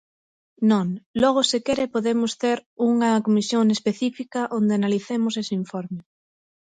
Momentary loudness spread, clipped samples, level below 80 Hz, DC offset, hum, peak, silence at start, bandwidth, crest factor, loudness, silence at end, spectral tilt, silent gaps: 8 LU; under 0.1%; -62 dBFS; under 0.1%; none; -6 dBFS; 0.6 s; 9.4 kHz; 16 dB; -22 LUFS; 0.75 s; -5 dB/octave; 1.06-1.14 s, 2.66-2.77 s